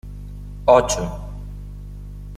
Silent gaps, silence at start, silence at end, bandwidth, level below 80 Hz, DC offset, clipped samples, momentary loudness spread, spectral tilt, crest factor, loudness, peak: none; 0.05 s; 0 s; 14 kHz; -34 dBFS; under 0.1%; under 0.1%; 22 LU; -4.5 dB/octave; 20 dB; -18 LUFS; -2 dBFS